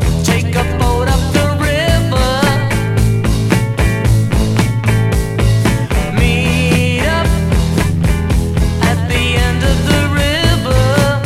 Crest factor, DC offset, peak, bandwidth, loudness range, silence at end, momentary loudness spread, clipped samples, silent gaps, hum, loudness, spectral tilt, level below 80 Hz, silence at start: 12 dB; under 0.1%; 0 dBFS; 16 kHz; 0 LU; 0 s; 2 LU; under 0.1%; none; none; -13 LUFS; -5.5 dB/octave; -20 dBFS; 0 s